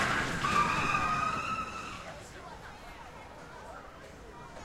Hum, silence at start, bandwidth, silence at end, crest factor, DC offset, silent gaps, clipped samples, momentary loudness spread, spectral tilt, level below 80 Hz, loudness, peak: none; 0 s; 16 kHz; 0 s; 18 dB; under 0.1%; none; under 0.1%; 20 LU; -3.5 dB/octave; -52 dBFS; -31 LUFS; -16 dBFS